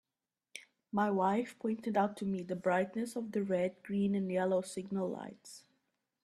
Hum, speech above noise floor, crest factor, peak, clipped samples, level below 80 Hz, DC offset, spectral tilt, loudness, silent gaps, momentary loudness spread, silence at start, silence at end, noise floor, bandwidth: none; over 56 dB; 18 dB; -18 dBFS; under 0.1%; -76 dBFS; under 0.1%; -6.5 dB/octave; -35 LUFS; none; 19 LU; 0.55 s; 0.65 s; under -90 dBFS; 13 kHz